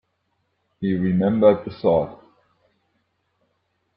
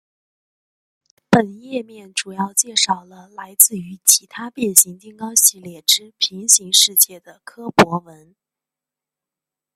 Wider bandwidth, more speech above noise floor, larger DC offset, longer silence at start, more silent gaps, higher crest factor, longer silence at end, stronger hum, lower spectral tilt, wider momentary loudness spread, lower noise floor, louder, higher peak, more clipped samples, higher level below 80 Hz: second, 5.4 kHz vs 16.5 kHz; second, 53 dB vs 69 dB; neither; second, 0.8 s vs 1.3 s; neither; about the same, 20 dB vs 20 dB; about the same, 1.8 s vs 1.75 s; neither; first, -12 dB/octave vs -1.5 dB/octave; second, 11 LU vs 16 LU; second, -72 dBFS vs -88 dBFS; second, -20 LUFS vs -15 LUFS; second, -4 dBFS vs 0 dBFS; neither; about the same, -58 dBFS vs -58 dBFS